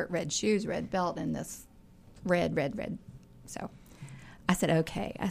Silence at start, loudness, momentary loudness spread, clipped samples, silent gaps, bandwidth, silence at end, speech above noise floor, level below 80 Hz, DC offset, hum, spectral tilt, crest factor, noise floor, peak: 0 s; -32 LUFS; 19 LU; under 0.1%; none; 15.5 kHz; 0 s; 24 dB; -56 dBFS; under 0.1%; none; -5 dB/octave; 24 dB; -55 dBFS; -10 dBFS